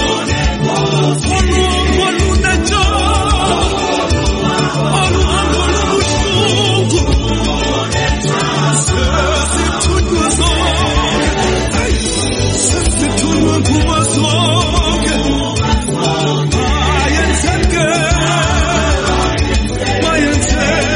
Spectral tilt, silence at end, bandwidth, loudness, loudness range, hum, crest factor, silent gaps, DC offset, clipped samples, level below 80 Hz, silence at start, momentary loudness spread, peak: -4 dB/octave; 0 s; 11 kHz; -13 LUFS; 1 LU; none; 12 dB; none; under 0.1%; under 0.1%; -18 dBFS; 0 s; 3 LU; 0 dBFS